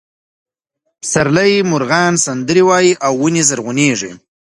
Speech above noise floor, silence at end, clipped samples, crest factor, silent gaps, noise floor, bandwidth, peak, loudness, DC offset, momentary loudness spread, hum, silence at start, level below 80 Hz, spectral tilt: 58 dB; 0.25 s; under 0.1%; 14 dB; none; -71 dBFS; 11.5 kHz; 0 dBFS; -13 LUFS; under 0.1%; 6 LU; none; 1.05 s; -54 dBFS; -4 dB/octave